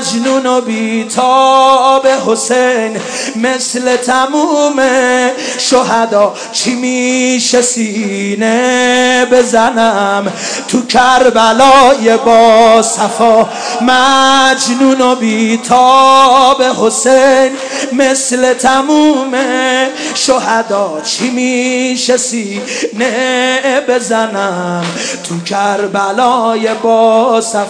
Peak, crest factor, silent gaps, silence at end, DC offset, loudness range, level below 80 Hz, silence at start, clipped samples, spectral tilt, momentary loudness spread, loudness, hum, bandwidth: 0 dBFS; 10 dB; none; 0 s; under 0.1%; 6 LU; -50 dBFS; 0 s; 2%; -2.5 dB/octave; 8 LU; -10 LUFS; none; 11 kHz